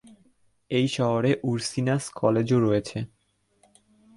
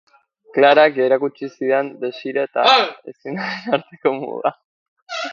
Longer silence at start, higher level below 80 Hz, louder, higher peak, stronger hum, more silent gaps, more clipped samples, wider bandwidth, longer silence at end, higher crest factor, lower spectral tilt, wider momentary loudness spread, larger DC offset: first, 0.7 s vs 0.55 s; first, -60 dBFS vs -74 dBFS; second, -25 LUFS vs -18 LUFS; second, -8 dBFS vs 0 dBFS; neither; second, none vs 4.65-4.96 s, 5.02-5.06 s; neither; first, 11.5 kHz vs 7.4 kHz; first, 1.1 s vs 0 s; about the same, 20 dB vs 18 dB; first, -6 dB/octave vs -4.5 dB/octave; second, 9 LU vs 13 LU; neither